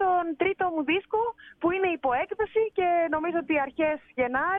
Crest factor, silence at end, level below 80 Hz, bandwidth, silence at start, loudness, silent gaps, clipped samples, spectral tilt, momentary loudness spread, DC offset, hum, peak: 14 dB; 0 s; -60 dBFS; 3.8 kHz; 0 s; -27 LUFS; none; under 0.1%; -8 dB/octave; 4 LU; under 0.1%; none; -12 dBFS